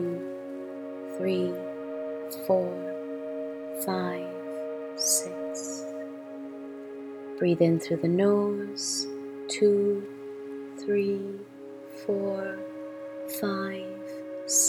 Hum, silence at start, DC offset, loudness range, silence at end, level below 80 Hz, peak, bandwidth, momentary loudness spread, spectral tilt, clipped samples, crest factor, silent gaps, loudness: none; 0 s; under 0.1%; 6 LU; 0 s; -76 dBFS; -10 dBFS; 19 kHz; 16 LU; -4 dB/octave; under 0.1%; 20 dB; none; -30 LUFS